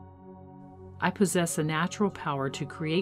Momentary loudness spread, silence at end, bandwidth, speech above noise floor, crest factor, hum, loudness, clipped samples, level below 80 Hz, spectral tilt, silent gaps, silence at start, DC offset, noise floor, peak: 23 LU; 0 s; 16 kHz; 20 dB; 20 dB; none; -29 LUFS; under 0.1%; -66 dBFS; -5 dB/octave; none; 0 s; under 0.1%; -48 dBFS; -10 dBFS